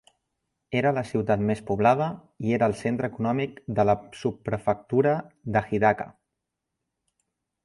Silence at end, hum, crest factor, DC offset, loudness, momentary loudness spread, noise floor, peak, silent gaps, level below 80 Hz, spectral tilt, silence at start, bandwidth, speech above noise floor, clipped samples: 1.55 s; none; 20 dB; under 0.1%; -26 LUFS; 8 LU; -83 dBFS; -6 dBFS; none; -56 dBFS; -7.5 dB/octave; 0.7 s; 11.5 kHz; 58 dB; under 0.1%